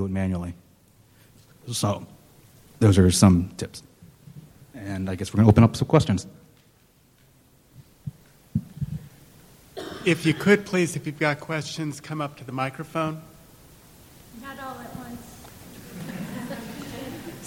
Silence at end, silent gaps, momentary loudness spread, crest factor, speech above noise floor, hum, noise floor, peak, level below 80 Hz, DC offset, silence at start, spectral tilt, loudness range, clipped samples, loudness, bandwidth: 0 s; none; 23 LU; 22 dB; 37 dB; none; -59 dBFS; -4 dBFS; -50 dBFS; under 0.1%; 0 s; -6 dB/octave; 15 LU; under 0.1%; -24 LUFS; 17 kHz